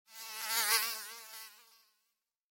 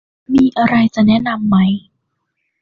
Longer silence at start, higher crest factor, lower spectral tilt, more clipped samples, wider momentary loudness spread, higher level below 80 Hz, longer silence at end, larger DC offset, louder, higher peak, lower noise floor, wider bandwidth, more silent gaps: second, 0.1 s vs 0.3 s; first, 26 dB vs 12 dB; second, 4 dB/octave vs -7.5 dB/octave; neither; first, 19 LU vs 5 LU; second, under -90 dBFS vs -48 dBFS; about the same, 0.9 s vs 0.85 s; neither; second, -32 LUFS vs -14 LUFS; second, -14 dBFS vs -2 dBFS; first, -84 dBFS vs -70 dBFS; first, 17 kHz vs 7 kHz; neither